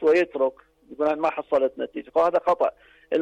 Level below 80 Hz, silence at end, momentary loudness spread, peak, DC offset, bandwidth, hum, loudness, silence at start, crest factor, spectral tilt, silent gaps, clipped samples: -64 dBFS; 0 s; 6 LU; -12 dBFS; under 0.1%; 8.6 kHz; none; -24 LUFS; 0 s; 12 dB; -5.5 dB/octave; none; under 0.1%